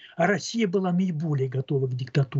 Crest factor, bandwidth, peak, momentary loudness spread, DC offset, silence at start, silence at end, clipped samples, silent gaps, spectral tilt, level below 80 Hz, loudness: 16 dB; 8 kHz; -10 dBFS; 3 LU; under 0.1%; 0.05 s; 0 s; under 0.1%; none; -6.5 dB/octave; -74 dBFS; -26 LUFS